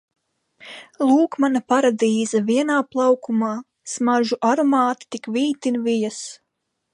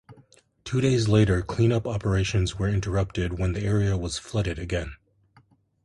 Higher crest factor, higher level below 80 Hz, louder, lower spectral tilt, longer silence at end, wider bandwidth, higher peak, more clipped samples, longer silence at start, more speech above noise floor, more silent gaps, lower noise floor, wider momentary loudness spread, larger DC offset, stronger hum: about the same, 16 dB vs 18 dB; second, -76 dBFS vs -38 dBFS; first, -20 LUFS vs -25 LUFS; second, -4.5 dB/octave vs -6.5 dB/octave; second, 0.6 s vs 0.9 s; about the same, 11 kHz vs 11.5 kHz; about the same, -6 dBFS vs -8 dBFS; neither; first, 0.6 s vs 0.1 s; second, 32 dB vs 37 dB; neither; second, -51 dBFS vs -60 dBFS; first, 14 LU vs 9 LU; neither; neither